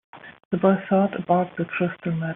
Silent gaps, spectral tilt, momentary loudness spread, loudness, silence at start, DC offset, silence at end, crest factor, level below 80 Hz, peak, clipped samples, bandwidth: 0.45-0.51 s; -7 dB/octave; 7 LU; -23 LUFS; 0.15 s; under 0.1%; 0 s; 18 dB; -64 dBFS; -6 dBFS; under 0.1%; 3.8 kHz